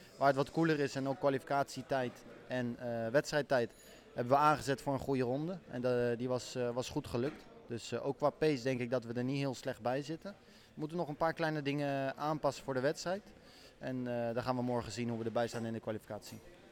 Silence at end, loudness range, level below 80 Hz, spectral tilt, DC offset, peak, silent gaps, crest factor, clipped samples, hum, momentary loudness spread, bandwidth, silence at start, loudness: 0.05 s; 4 LU; -66 dBFS; -6 dB/octave; under 0.1%; -16 dBFS; none; 20 dB; under 0.1%; none; 11 LU; 18 kHz; 0 s; -36 LUFS